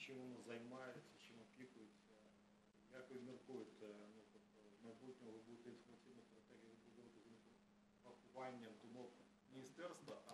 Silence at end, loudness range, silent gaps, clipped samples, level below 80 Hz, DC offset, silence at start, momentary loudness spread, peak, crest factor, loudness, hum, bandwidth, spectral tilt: 0 s; 4 LU; none; under 0.1%; under -90 dBFS; under 0.1%; 0 s; 12 LU; -40 dBFS; 20 dB; -60 LUFS; none; 13 kHz; -5 dB/octave